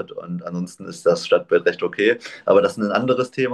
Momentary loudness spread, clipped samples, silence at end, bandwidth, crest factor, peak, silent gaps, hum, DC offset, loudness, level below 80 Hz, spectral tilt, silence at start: 12 LU; under 0.1%; 0 s; 12 kHz; 16 dB; -4 dBFS; none; none; under 0.1%; -20 LUFS; -64 dBFS; -5.5 dB/octave; 0 s